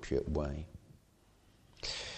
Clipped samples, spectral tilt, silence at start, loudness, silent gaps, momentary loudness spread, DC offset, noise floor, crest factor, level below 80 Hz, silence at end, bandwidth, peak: under 0.1%; -5 dB/octave; 0 s; -39 LUFS; none; 17 LU; under 0.1%; -66 dBFS; 20 dB; -48 dBFS; 0 s; 9.6 kHz; -20 dBFS